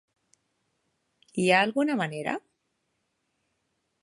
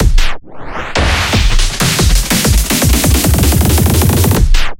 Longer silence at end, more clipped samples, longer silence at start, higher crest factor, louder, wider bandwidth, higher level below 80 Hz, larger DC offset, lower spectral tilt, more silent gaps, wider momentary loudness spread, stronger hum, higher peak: first, 1.65 s vs 0.05 s; neither; first, 1.35 s vs 0 s; first, 24 dB vs 10 dB; second, -26 LUFS vs -11 LUFS; second, 11.5 kHz vs 17.5 kHz; second, -78 dBFS vs -12 dBFS; neither; about the same, -5 dB/octave vs -4 dB/octave; neither; first, 14 LU vs 8 LU; neither; second, -6 dBFS vs 0 dBFS